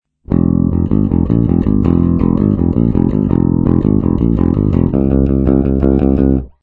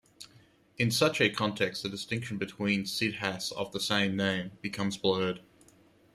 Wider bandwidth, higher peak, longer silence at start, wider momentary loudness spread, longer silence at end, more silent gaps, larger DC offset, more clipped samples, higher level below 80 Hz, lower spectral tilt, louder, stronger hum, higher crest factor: second, 4.1 kHz vs 14.5 kHz; first, 0 dBFS vs -10 dBFS; about the same, 0.3 s vs 0.2 s; second, 2 LU vs 10 LU; second, 0.15 s vs 0.75 s; neither; neither; first, 0.3% vs under 0.1%; first, -22 dBFS vs -68 dBFS; first, -12.5 dB/octave vs -4 dB/octave; first, -13 LUFS vs -30 LUFS; neither; second, 12 dB vs 22 dB